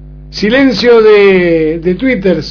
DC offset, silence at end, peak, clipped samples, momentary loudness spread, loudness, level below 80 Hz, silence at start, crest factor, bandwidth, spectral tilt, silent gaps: under 0.1%; 0 s; 0 dBFS; 1%; 8 LU; -8 LUFS; -32 dBFS; 0 s; 8 dB; 5.4 kHz; -6.5 dB/octave; none